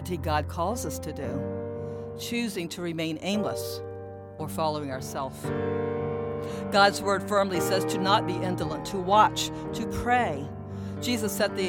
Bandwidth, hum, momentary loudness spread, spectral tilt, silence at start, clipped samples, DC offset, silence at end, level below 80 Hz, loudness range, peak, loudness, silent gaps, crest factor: 19 kHz; none; 13 LU; -4.5 dB/octave; 0 s; under 0.1%; under 0.1%; 0 s; -50 dBFS; 7 LU; -8 dBFS; -28 LUFS; none; 20 dB